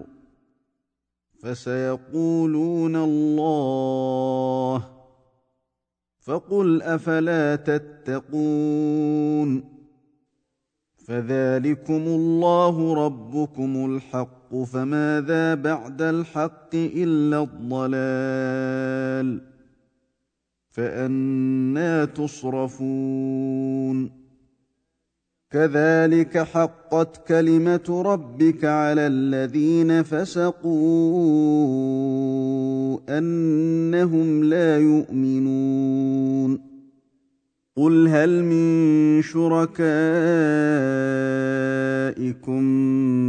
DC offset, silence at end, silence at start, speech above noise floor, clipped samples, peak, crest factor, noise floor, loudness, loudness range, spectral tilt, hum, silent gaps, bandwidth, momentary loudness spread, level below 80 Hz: under 0.1%; 0 s; 0 s; 63 dB; under 0.1%; -4 dBFS; 16 dB; -83 dBFS; -21 LUFS; 6 LU; -8 dB/octave; none; none; 9 kHz; 9 LU; -66 dBFS